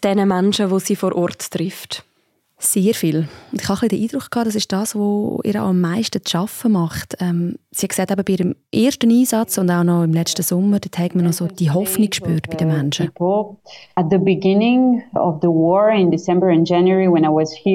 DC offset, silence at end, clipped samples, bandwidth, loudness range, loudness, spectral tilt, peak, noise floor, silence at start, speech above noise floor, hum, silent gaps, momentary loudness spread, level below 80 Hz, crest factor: under 0.1%; 0 s; under 0.1%; 16.5 kHz; 5 LU; -18 LUFS; -5.5 dB/octave; -4 dBFS; -64 dBFS; 0 s; 47 dB; none; none; 8 LU; -56 dBFS; 12 dB